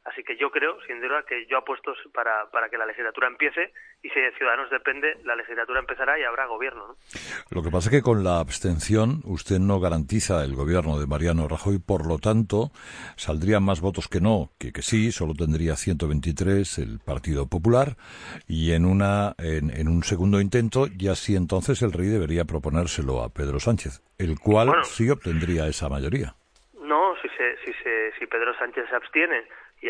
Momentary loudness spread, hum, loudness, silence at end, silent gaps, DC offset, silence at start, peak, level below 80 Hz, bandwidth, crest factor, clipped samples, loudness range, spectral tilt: 9 LU; none; -24 LUFS; 0 s; none; under 0.1%; 0.05 s; -6 dBFS; -38 dBFS; 10.5 kHz; 18 dB; under 0.1%; 3 LU; -6 dB/octave